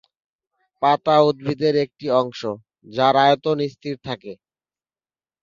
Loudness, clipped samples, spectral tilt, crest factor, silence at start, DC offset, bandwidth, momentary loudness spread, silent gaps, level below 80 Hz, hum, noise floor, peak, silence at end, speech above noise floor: -20 LUFS; under 0.1%; -6.5 dB/octave; 20 dB; 0.8 s; under 0.1%; 7.4 kHz; 15 LU; none; -64 dBFS; none; under -90 dBFS; -2 dBFS; 1.1 s; over 71 dB